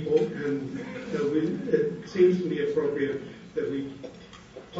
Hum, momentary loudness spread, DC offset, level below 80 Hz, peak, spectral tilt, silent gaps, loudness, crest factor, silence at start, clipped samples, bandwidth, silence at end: none; 19 LU; under 0.1%; -62 dBFS; -10 dBFS; -7.5 dB/octave; none; -28 LUFS; 18 dB; 0 s; under 0.1%; 7.8 kHz; 0 s